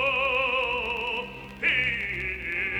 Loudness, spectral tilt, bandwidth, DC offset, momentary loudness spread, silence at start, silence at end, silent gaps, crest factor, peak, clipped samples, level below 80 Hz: -26 LUFS; -4.5 dB/octave; over 20 kHz; under 0.1%; 7 LU; 0 s; 0 s; none; 18 dB; -10 dBFS; under 0.1%; -48 dBFS